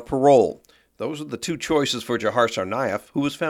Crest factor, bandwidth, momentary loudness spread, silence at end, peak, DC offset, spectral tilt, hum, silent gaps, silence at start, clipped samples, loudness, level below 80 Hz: 18 dB; 16.5 kHz; 14 LU; 0 s; -4 dBFS; under 0.1%; -4.5 dB/octave; none; none; 0 s; under 0.1%; -22 LUFS; -56 dBFS